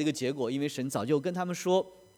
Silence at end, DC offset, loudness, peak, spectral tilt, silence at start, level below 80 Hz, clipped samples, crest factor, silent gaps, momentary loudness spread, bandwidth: 0.25 s; under 0.1%; -31 LUFS; -14 dBFS; -5.5 dB/octave; 0 s; -76 dBFS; under 0.1%; 18 dB; none; 4 LU; 19 kHz